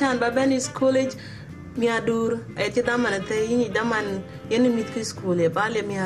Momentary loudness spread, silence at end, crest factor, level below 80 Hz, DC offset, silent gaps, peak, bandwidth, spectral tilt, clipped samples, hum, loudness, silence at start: 8 LU; 0 s; 16 dB; -54 dBFS; under 0.1%; none; -8 dBFS; 13 kHz; -5 dB/octave; under 0.1%; none; -23 LUFS; 0 s